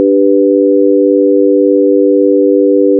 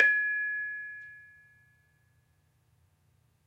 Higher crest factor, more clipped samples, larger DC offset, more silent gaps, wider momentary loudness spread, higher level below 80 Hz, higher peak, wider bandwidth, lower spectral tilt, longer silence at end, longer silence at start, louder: second, 8 dB vs 26 dB; neither; neither; neither; second, 0 LU vs 23 LU; second, under -90 dBFS vs -80 dBFS; first, 0 dBFS vs -8 dBFS; second, 0.6 kHz vs 7.2 kHz; first, -5.5 dB/octave vs -2.5 dB/octave; second, 0 s vs 2.2 s; about the same, 0 s vs 0 s; first, -9 LUFS vs -30 LUFS